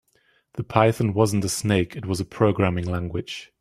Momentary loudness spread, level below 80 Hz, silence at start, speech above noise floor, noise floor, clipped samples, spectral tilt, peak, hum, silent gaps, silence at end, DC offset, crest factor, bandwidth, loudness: 11 LU; -52 dBFS; 0.55 s; 42 dB; -64 dBFS; under 0.1%; -6 dB/octave; -2 dBFS; none; none; 0.15 s; under 0.1%; 22 dB; 15 kHz; -23 LUFS